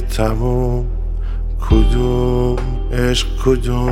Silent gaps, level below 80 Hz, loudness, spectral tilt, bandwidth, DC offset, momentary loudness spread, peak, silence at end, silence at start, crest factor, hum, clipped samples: none; -18 dBFS; -18 LUFS; -6.5 dB/octave; 12.5 kHz; under 0.1%; 9 LU; 0 dBFS; 0 s; 0 s; 14 dB; none; under 0.1%